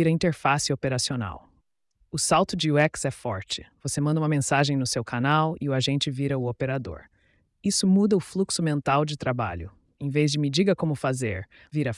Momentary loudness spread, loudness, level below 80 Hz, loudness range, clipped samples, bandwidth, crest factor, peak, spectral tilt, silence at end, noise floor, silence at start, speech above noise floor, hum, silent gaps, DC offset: 11 LU; -25 LUFS; -56 dBFS; 2 LU; under 0.1%; 12 kHz; 16 dB; -8 dBFS; -5 dB/octave; 0 s; -69 dBFS; 0 s; 44 dB; none; none; under 0.1%